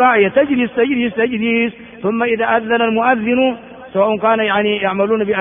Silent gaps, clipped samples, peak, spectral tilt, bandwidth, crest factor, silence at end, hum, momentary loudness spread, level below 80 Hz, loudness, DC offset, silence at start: none; under 0.1%; 0 dBFS; -3 dB/octave; 3.7 kHz; 14 dB; 0 s; none; 5 LU; -54 dBFS; -15 LUFS; under 0.1%; 0 s